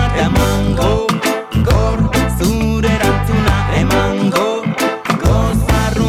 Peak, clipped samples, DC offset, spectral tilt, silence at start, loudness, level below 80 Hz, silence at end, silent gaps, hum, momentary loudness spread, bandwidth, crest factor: -4 dBFS; under 0.1%; under 0.1%; -6 dB/octave; 0 s; -15 LUFS; -20 dBFS; 0 s; none; none; 3 LU; 17 kHz; 10 dB